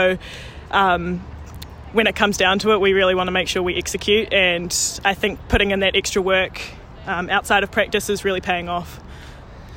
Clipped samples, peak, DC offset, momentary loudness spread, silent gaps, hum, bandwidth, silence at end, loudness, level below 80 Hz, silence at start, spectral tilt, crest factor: under 0.1%; -4 dBFS; under 0.1%; 19 LU; none; none; 16.5 kHz; 0 s; -19 LUFS; -38 dBFS; 0 s; -3 dB/octave; 16 dB